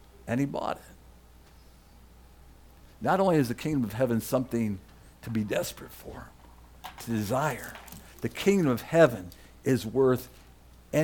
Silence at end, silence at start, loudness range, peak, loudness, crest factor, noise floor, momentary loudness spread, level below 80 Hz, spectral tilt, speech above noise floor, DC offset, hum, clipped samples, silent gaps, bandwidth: 0 s; 0.25 s; 7 LU; -8 dBFS; -28 LUFS; 22 dB; -54 dBFS; 21 LU; -54 dBFS; -6 dB/octave; 27 dB; under 0.1%; none; under 0.1%; none; 19 kHz